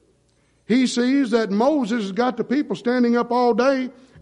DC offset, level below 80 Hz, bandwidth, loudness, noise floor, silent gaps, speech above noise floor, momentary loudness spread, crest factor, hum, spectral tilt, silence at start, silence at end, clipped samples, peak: under 0.1%; -64 dBFS; 10.5 kHz; -20 LUFS; -62 dBFS; none; 42 dB; 5 LU; 14 dB; none; -5.5 dB/octave; 0.7 s; 0.3 s; under 0.1%; -6 dBFS